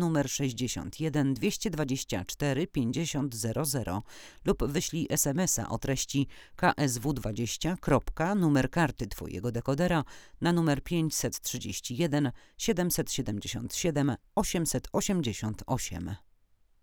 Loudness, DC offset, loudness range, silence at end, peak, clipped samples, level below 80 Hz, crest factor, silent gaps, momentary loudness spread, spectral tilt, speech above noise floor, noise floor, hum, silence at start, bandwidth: -30 LUFS; under 0.1%; 2 LU; 0.65 s; -10 dBFS; under 0.1%; -46 dBFS; 20 dB; none; 8 LU; -4.5 dB/octave; 34 dB; -64 dBFS; none; 0 s; over 20 kHz